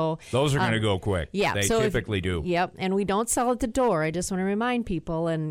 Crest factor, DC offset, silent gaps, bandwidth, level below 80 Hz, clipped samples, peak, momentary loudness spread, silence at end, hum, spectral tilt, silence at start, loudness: 12 dB; under 0.1%; none; 16 kHz; -44 dBFS; under 0.1%; -12 dBFS; 5 LU; 0 s; none; -5 dB/octave; 0 s; -25 LUFS